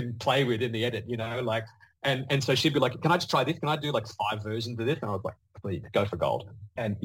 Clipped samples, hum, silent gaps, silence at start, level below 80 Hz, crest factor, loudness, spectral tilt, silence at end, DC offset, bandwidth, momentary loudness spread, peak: under 0.1%; none; none; 0 s; -60 dBFS; 18 dB; -29 LUFS; -5.5 dB/octave; 0 s; under 0.1%; 17 kHz; 10 LU; -10 dBFS